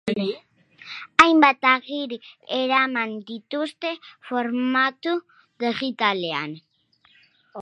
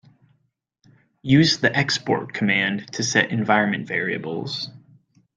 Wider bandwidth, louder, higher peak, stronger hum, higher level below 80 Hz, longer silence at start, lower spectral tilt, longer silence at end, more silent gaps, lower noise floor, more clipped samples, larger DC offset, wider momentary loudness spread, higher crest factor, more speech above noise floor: about the same, 10 kHz vs 9.4 kHz; about the same, -22 LUFS vs -21 LUFS; about the same, 0 dBFS vs -2 dBFS; neither; second, -66 dBFS vs -60 dBFS; second, 0.05 s vs 1.25 s; about the same, -4 dB/octave vs -4.5 dB/octave; second, 0 s vs 0.6 s; neither; second, -61 dBFS vs -70 dBFS; neither; neither; first, 20 LU vs 11 LU; about the same, 24 dB vs 20 dB; second, 38 dB vs 49 dB